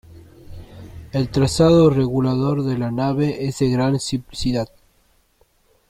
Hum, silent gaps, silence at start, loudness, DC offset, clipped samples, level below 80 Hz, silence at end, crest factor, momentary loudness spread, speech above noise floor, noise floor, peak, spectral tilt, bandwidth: none; none; 0.15 s; -19 LUFS; under 0.1%; under 0.1%; -42 dBFS; 1.25 s; 18 dB; 13 LU; 42 dB; -60 dBFS; -4 dBFS; -6.5 dB/octave; 15 kHz